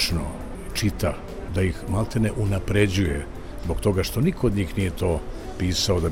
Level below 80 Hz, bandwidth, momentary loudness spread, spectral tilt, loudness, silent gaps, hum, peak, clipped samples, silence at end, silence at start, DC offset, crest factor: -34 dBFS; 17 kHz; 10 LU; -5.5 dB/octave; -25 LUFS; none; none; -6 dBFS; under 0.1%; 0 s; 0 s; under 0.1%; 16 dB